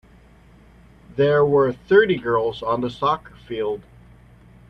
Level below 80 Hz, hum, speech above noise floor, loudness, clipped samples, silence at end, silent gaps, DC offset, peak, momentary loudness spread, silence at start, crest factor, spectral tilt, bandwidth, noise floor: -52 dBFS; none; 30 dB; -20 LUFS; under 0.1%; 0.9 s; none; under 0.1%; -2 dBFS; 12 LU; 1.15 s; 20 dB; -7.5 dB/octave; 6 kHz; -50 dBFS